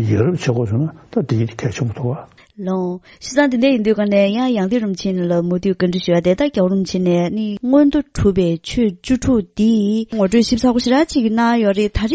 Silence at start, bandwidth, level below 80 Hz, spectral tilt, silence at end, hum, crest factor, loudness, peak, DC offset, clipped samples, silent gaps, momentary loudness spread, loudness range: 0 s; 8 kHz; -38 dBFS; -6.5 dB/octave; 0 s; none; 16 dB; -17 LUFS; 0 dBFS; under 0.1%; under 0.1%; none; 7 LU; 4 LU